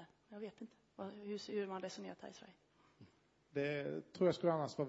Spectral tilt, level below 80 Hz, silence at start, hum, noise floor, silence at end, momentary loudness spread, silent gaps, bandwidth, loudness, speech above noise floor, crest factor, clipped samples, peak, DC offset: -5.5 dB/octave; -84 dBFS; 0 s; none; -71 dBFS; 0 s; 19 LU; none; 7.6 kHz; -42 LUFS; 29 dB; 20 dB; under 0.1%; -22 dBFS; under 0.1%